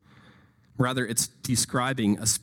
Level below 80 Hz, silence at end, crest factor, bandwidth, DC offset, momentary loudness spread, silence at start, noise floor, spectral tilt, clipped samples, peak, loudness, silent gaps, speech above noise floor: -56 dBFS; 0.05 s; 20 dB; 17.5 kHz; under 0.1%; 4 LU; 0.75 s; -57 dBFS; -3.5 dB/octave; under 0.1%; -6 dBFS; -26 LUFS; none; 31 dB